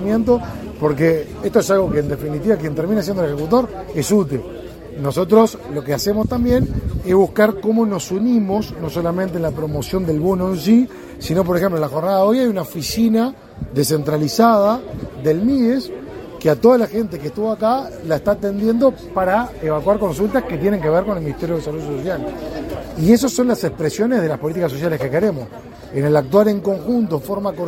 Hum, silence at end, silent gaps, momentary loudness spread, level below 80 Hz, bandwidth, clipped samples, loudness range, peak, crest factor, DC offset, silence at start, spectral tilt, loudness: none; 0 s; none; 10 LU; -38 dBFS; 16.5 kHz; under 0.1%; 2 LU; 0 dBFS; 18 dB; under 0.1%; 0 s; -6.5 dB/octave; -18 LUFS